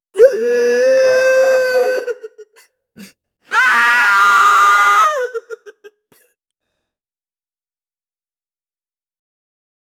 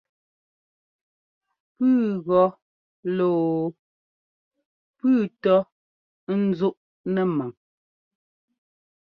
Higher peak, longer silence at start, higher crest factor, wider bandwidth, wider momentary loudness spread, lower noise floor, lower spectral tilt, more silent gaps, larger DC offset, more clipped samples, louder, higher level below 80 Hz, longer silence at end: first, 0 dBFS vs -8 dBFS; second, 0.15 s vs 1.8 s; about the same, 16 dB vs 18 dB; first, 17.5 kHz vs 5.2 kHz; about the same, 12 LU vs 12 LU; about the same, under -90 dBFS vs under -90 dBFS; second, -0.5 dB/octave vs -10 dB/octave; second, none vs 2.62-3.03 s, 3.79-4.51 s, 4.65-4.94 s, 5.72-6.27 s, 6.77-7.04 s; neither; neither; first, -12 LUFS vs -23 LUFS; about the same, -66 dBFS vs -70 dBFS; first, 4.1 s vs 1.6 s